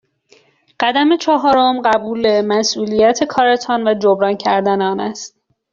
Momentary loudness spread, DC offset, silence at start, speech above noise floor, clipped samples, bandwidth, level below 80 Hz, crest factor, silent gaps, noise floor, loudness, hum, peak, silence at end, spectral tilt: 6 LU; under 0.1%; 0.8 s; 38 dB; under 0.1%; 7.6 kHz; -56 dBFS; 14 dB; none; -53 dBFS; -15 LUFS; none; -2 dBFS; 0.45 s; -4 dB/octave